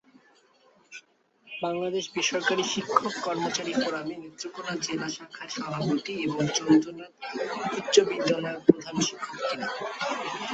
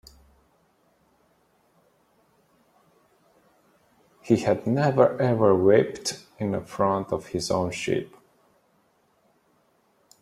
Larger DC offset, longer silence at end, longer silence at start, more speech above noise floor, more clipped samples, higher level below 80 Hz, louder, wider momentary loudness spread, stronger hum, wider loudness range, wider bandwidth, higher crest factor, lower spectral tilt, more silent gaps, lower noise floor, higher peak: neither; second, 0 s vs 2.15 s; second, 0.9 s vs 4.25 s; second, 34 dB vs 43 dB; neither; second, -68 dBFS vs -62 dBFS; second, -28 LUFS vs -24 LUFS; first, 15 LU vs 10 LU; neither; second, 5 LU vs 9 LU; second, 8.2 kHz vs 14.5 kHz; about the same, 26 dB vs 24 dB; second, -4 dB/octave vs -6 dB/octave; neither; second, -62 dBFS vs -66 dBFS; about the same, -2 dBFS vs -4 dBFS